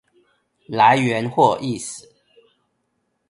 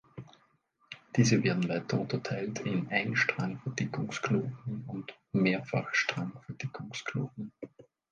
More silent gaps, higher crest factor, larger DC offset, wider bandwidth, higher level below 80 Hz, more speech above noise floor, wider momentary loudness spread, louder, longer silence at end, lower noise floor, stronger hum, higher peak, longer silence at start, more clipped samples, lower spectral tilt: neither; about the same, 20 dB vs 22 dB; neither; first, 11.5 kHz vs 9.6 kHz; first, -62 dBFS vs -68 dBFS; first, 53 dB vs 38 dB; about the same, 16 LU vs 16 LU; first, -18 LUFS vs -32 LUFS; first, 1.3 s vs 0.3 s; about the same, -71 dBFS vs -70 dBFS; neither; first, -2 dBFS vs -12 dBFS; first, 0.7 s vs 0.15 s; neither; about the same, -5 dB/octave vs -5.5 dB/octave